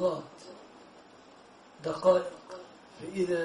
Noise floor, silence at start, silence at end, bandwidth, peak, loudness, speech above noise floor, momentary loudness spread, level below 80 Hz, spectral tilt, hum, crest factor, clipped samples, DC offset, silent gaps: -55 dBFS; 0 s; 0 s; 11.5 kHz; -10 dBFS; -30 LUFS; 26 dB; 26 LU; -70 dBFS; -6 dB/octave; none; 22 dB; under 0.1%; under 0.1%; none